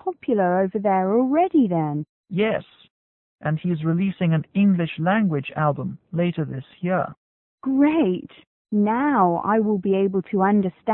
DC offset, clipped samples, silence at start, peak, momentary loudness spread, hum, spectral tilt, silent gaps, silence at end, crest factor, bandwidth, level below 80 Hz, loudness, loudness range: under 0.1%; under 0.1%; 0.05 s; -6 dBFS; 10 LU; none; -12.5 dB/octave; 2.09-2.24 s, 2.90-3.36 s, 7.17-7.58 s, 8.47-8.65 s; 0 s; 16 dB; 4 kHz; -62 dBFS; -22 LUFS; 3 LU